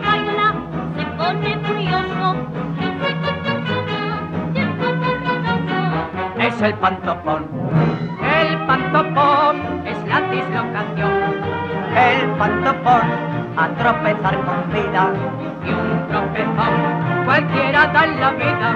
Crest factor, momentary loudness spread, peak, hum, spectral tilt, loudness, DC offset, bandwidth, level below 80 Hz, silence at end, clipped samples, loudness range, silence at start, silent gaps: 16 dB; 8 LU; -2 dBFS; none; -7.5 dB/octave; -18 LUFS; under 0.1%; 6.8 kHz; -46 dBFS; 0 s; under 0.1%; 4 LU; 0 s; none